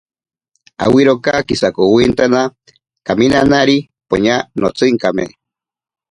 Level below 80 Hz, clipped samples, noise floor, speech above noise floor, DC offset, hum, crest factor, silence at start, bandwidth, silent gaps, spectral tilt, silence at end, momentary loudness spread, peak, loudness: -42 dBFS; under 0.1%; -83 dBFS; 71 dB; under 0.1%; none; 14 dB; 0.8 s; 11 kHz; none; -5.5 dB/octave; 0.85 s; 9 LU; 0 dBFS; -13 LUFS